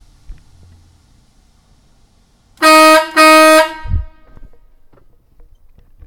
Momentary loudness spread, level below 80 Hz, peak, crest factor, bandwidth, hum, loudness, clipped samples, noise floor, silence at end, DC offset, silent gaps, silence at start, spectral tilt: 18 LU; -32 dBFS; 0 dBFS; 14 dB; 19.5 kHz; none; -8 LUFS; under 0.1%; -52 dBFS; 2 s; under 0.1%; none; 0.3 s; -3 dB/octave